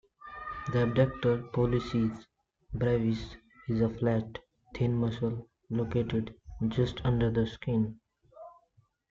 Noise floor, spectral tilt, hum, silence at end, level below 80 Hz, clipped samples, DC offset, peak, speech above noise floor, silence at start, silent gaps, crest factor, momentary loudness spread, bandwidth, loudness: -69 dBFS; -8.5 dB/octave; none; 0.6 s; -50 dBFS; under 0.1%; under 0.1%; -12 dBFS; 39 dB; 0.25 s; none; 18 dB; 16 LU; 7.2 kHz; -31 LUFS